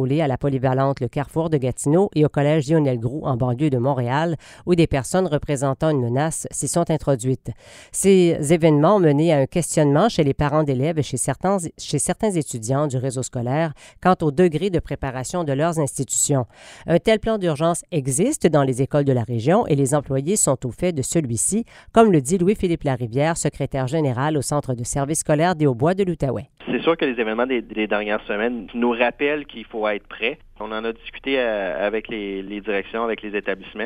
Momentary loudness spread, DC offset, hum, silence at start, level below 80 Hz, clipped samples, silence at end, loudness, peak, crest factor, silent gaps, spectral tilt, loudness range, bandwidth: 8 LU; under 0.1%; none; 0 s; -44 dBFS; under 0.1%; 0 s; -21 LUFS; 0 dBFS; 20 dB; none; -5.5 dB/octave; 5 LU; 15.5 kHz